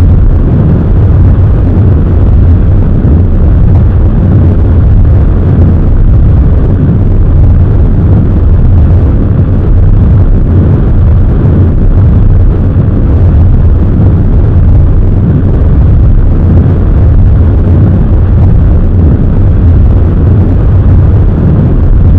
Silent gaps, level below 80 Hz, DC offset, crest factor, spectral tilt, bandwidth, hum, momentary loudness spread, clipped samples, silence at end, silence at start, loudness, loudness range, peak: none; -6 dBFS; 1%; 4 dB; -12 dB/octave; 3.5 kHz; none; 2 LU; 20%; 0 s; 0 s; -6 LUFS; 0 LU; 0 dBFS